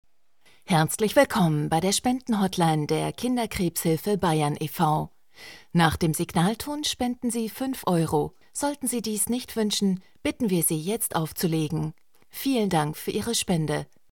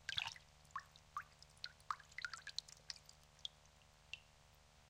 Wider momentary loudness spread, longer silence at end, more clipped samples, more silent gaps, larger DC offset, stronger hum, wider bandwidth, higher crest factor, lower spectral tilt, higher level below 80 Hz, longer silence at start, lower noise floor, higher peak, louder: second, 7 LU vs 20 LU; first, 0.3 s vs 0 s; neither; neither; first, 0.2% vs under 0.1%; neither; about the same, 18 kHz vs 16.5 kHz; second, 20 dB vs 32 dB; first, -4.5 dB/octave vs 0 dB/octave; first, -52 dBFS vs -74 dBFS; first, 0.7 s vs 0 s; second, -63 dBFS vs -68 dBFS; first, -6 dBFS vs -22 dBFS; first, -25 LUFS vs -51 LUFS